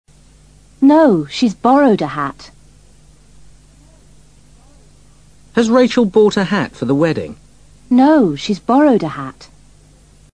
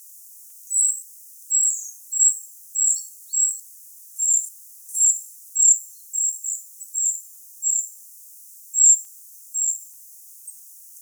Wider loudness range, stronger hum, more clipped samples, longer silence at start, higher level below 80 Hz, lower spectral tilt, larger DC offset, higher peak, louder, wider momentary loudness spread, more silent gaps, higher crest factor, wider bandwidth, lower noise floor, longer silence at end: first, 8 LU vs 2 LU; neither; neither; first, 0.8 s vs 0.1 s; first, -48 dBFS vs under -90 dBFS; first, -6.5 dB/octave vs 9 dB/octave; first, 0.3% vs under 0.1%; first, 0 dBFS vs -4 dBFS; first, -14 LUFS vs -19 LUFS; second, 13 LU vs 24 LU; neither; about the same, 16 dB vs 20 dB; second, 10 kHz vs over 20 kHz; about the same, -47 dBFS vs -44 dBFS; first, 0.9 s vs 0 s